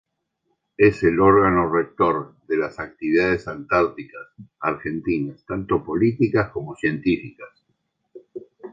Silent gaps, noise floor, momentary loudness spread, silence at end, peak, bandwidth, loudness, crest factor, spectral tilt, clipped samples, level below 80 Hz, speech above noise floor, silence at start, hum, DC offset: none; -73 dBFS; 21 LU; 0.05 s; -2 dBFS; 7.6 kHz; -21 LUFS; 20 dB; -8.5 dB/octave; under 0.1%; -48 dBFS; 52 dB; 0.8 s; none; under 0.1%